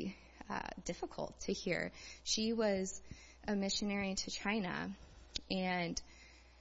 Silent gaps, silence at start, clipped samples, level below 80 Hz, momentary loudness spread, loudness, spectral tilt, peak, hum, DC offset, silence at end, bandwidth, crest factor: none; 0 s; under 0.1%; -60 dBFS; 13 LU; -39 LUFS; -3.5 dB/octave; -20 dBFS; none; under 0.1%; 0 s; 7.6 kHz; 20 dB